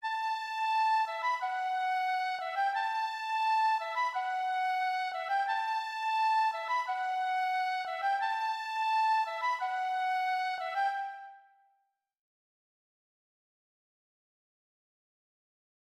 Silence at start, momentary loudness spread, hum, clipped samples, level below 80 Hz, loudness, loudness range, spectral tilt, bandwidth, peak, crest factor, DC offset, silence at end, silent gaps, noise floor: 0 s; 5 LU; none; under 0.1%; under -90 dBFS; -31 LUFS; 5 LU; 2.5 dB/octave; 14.5 kHz; -20 dBFS; 12 dB; under 0.1%; 4.5 s; none; -77 dBFS